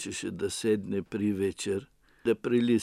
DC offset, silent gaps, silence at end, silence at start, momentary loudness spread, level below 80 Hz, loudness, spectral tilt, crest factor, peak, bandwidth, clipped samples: under 0.1%; none; 0 s; 0 s; 7 LU; -64 dBFS; -30 LUFS; -5 dB/octave; 14 dB; -14 dBFS; 14.5 kHz; under 0.1%